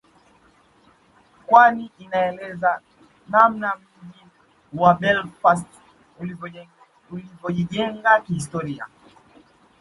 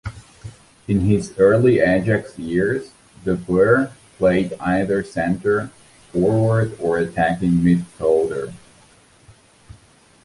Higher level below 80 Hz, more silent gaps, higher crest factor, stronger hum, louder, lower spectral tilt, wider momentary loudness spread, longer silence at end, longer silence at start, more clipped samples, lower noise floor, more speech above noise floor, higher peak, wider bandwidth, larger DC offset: second, -60 dBFS vs -44 dBFS; neither; about the same, 22 dB vs 18 dB; neither; about the same, -20 LUFS vs -19 LUFS; second, -5.5 dB/octave vs -8 dB/octave; first, 20 LU vs 12 LU; second, 0.95 s vs 1.7 s; first, 1.5 s vs 0.05 s; neither; first, -57 dBFS vs -51 dBFS; about the same, 37 dB vs 34 dB; about the same, 0 dBFS vs -2 dBFS; about the same, 11.5 kHz vs 11.5 kHz; neither